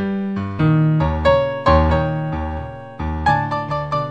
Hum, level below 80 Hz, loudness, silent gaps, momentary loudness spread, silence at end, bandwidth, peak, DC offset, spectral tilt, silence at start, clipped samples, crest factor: none; -28 dBFS; -18 LUFS; none; 11 LU; 0 s; 7.8 kHz; -2 dBFS; 0.4%; -8.5 dB/octave; 0 s; under 0.1%; 16 dB